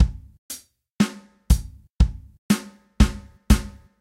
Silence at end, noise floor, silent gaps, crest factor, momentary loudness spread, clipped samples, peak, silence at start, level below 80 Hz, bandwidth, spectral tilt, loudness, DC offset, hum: 0.3 s; -41 dBFS; 0.38-0.49 s, 0.90-0.96 s, 1.90-1.94 s, 2.38-2.49 s; 20 dB; 19 LU; under 0.1%; -2 dBFS; 0 s; -26 dBFS; 16 kHz; -5.5 dB/octave; -23 LUFS; under 0.1%; none